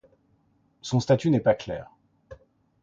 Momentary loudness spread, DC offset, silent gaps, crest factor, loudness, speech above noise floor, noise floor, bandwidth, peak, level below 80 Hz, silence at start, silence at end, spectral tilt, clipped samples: 15 LU; under 0.1%; none; 20 dB; -25 LUFS; 42 dB; -66 dBFS; 7.8 kHz; -8 dBFS; -58 dBFS; 0.85 s; 0.5 s; -7 dB/octave; under 0.1%